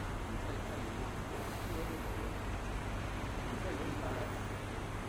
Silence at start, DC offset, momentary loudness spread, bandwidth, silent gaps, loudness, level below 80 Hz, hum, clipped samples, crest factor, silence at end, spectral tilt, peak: 0 s; under 0.1%; 2 LU; 16.5 kHz; none; -41 LUFS; -44 dBFS; none; under 0.1%; 14 dB; 0 s; -5.5 dB/octave; -26 dBFS